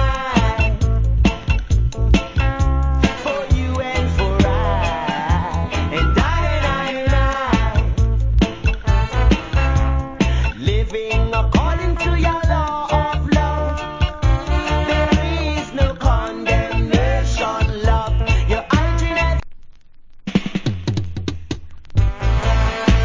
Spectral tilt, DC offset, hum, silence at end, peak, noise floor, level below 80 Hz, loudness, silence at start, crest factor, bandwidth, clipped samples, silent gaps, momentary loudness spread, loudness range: -6.5 dB/octave; under 0.1%; none; 0 s; 0 dBFS; -39 dBFS; -20 dBFS; -19 LUFS; 0 s; 16 dB; 7.6 kHz; under 0.1%; none; 5 LU; 2 LU